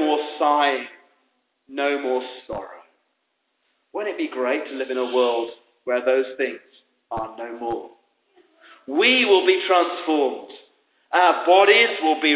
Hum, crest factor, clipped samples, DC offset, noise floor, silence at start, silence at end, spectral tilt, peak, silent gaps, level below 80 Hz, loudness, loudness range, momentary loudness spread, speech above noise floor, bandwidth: none; 18 dB; under 0.1%; under 0.1%; -73 dBFS; 0 s; 0 s; -6.5 dB/octave; -4 dBFS; none; -64 dBFS; -20 LUFS; 10 LU; 18 LU; 53 dB; 4 kHz